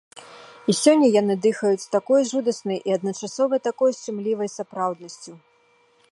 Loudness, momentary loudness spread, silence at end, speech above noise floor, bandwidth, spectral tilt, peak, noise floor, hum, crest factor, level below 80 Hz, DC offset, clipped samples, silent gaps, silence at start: -22 LUFS; 12 LU; 0.75 s; 39 dB; 11.5 kHz; -5 dB/octave; -2 dBFS; -60 dBFS; none; 20 dB; -78 dBFS; under 0.1%; under 0.1%; none; 0.15 s